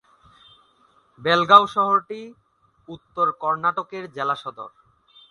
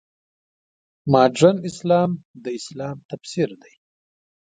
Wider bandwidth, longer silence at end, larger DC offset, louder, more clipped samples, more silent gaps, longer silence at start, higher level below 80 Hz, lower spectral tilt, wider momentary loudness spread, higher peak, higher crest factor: first, 11 kHz vs 9.4 kHz; second, 0.6 s vs 0.95 s; neither; about the same, -20 LUFS vs -20 LUFS; neither; second, none vs 2.25-2.34 s, 3.05-3.09 s; first, 1.2 s vs 1.05 s; second, -66 dBFS vs -60 dBFS; second, -5 dB/octave vs -6.5 dB/octave; first, 25 LU vs 16 LU; about the same, 0 dBFS vs 0 dBFS; about the same, 24 dB vs 22 dB